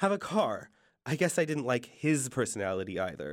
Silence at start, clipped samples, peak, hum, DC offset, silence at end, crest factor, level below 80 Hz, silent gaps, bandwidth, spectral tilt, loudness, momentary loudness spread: 0 s; under 0.1%; -12 dBFS; none; under 0.1%; 0 s; 18 dB; -68 dBFS; none; 16.5 kHz; -5 dB/octave; -31 LUFS; 7 LU